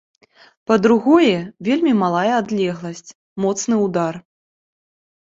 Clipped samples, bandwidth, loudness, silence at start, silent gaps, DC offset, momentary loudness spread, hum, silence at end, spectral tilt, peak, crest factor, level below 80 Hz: under 0.1%; 7.8 kHz; -18 LUFS; 0.7 s; 3.15-3.36 s; under 0.1%; 19 LU; none; 1 s; -5.5 dB/octave; 0 dBFS; 18 dB; -60 dBFS